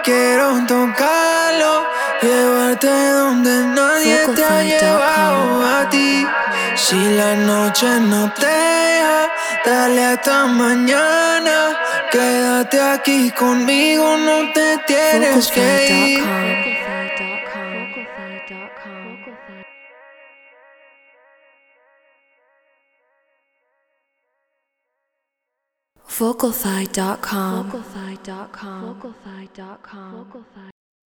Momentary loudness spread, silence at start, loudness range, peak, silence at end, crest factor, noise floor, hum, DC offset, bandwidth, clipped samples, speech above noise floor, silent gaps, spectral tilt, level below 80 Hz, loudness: 18 LU; 0 s; 15 LU; -2 dBFS; 0.5 s; 16 dB; -79 dBFS; none; under 0.1%; over 20 kHz; under 0.1%; 64 dB; none; -3 dB/octave; -60 dBFS; -15 LUFS